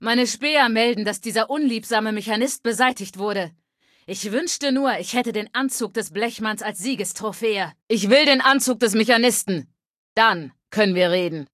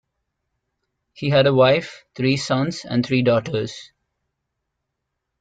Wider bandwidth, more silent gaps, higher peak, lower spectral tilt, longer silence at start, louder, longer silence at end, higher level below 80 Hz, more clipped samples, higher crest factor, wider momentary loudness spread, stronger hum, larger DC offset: first, 15 kHz vs 9.2 kHz; first, 7.83-7.87 s, 9.90-10.16 s vs none; about the same, -2 dBFS vs -4 dBFS; second, -3 dB/octave vs -6 dB/octave; second, 0 s vs 1.2 s; about the same, -21 LUFS vs -19 LUFS; second, 0.1 s vs 1.55 s; second, -70 dBFS vs -58 dBFS; neither; about the same, 20 dB vs 18 dB; second, 10 LU vs 13 LU; neither; neither